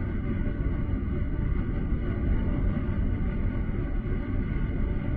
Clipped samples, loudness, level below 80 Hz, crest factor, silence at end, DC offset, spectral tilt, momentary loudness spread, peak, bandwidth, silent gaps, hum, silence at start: under 0.1%; -30 LUFS; -30 dBFS; 12 dB; 0 s; under 0.1%; -11.5 dB/octave; 3 LU; -16 dBFS; 3.7 kHz; none; none; 0 s